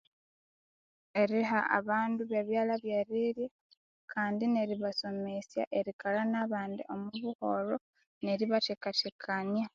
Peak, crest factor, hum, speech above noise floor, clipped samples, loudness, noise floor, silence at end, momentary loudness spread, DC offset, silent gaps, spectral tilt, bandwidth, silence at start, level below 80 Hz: -12 dBFS; 22 dB; none; over 57 dB; under 0.1%; -33 LUFS; under -90 dBFS; 0.05 s; 9 LU; under 0.1%; 3.51-3.70 s, 3.77-4.08 s, 5.67-5.71 s, 5.93-5.99 s, 7.35-7.39 s, 7.81-7.93 s, 8.06-8.21 s, 9.12-9.19 s; -3 dB/octave; 7.4 kHz; 1.15 s; -80 dBFS